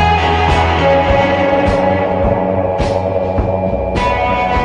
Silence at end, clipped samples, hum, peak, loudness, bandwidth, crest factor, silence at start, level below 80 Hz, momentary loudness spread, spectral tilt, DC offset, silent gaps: 0 s; under 0.1%; none; 0 dBFS; -14 LUFS; 10 kHz; 12 dB; 0 s; -24 dBFS; 4 LU; -6.5 dB/octave; under 0.1%; none